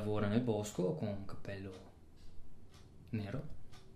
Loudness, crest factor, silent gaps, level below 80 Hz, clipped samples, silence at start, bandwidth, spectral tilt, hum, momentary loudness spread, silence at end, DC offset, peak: -40 LUFS; 20 dB; none; -58 dBFS; under 0.1%; 0 s; 15 kHz; -7 dB/octave; none; 26 LU; 0 s; under 0.1%; -20 dBFS